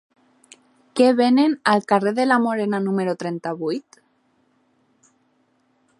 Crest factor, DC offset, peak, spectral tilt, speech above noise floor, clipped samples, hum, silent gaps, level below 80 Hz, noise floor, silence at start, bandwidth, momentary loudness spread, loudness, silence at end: 20 dB; under 0.1%; -2 dBFS; -6 dB/octave; 45 dB; under 0.1%; none; none; -76 dBFS; -64 dBFS; 0.95 s; 11.5 kHz; 11 LU; -20 LUFS; 2.2 s